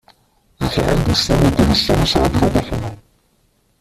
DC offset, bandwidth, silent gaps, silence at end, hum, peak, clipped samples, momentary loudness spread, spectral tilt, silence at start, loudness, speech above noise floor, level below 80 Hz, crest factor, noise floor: under 0.1%; 15 kHz; none; 0.85 s; none; -2 dBFS; under 0.1%; 11 LU; -5.5 dB/octave; 0.6 s; -16 LUFS; 45 dB; -28 dBFS; 16 dB; -60 dBFS